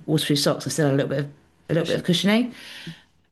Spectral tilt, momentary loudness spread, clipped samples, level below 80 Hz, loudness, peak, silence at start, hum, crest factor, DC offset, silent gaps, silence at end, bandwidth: -5 dB/octave; 17 LU; under 0.1%; -62 dBFS; -22 LUFS; -8 dBFS; 0 s; none; 14 dB; under 0.1%; none; 0.35 s; 12.5 kHz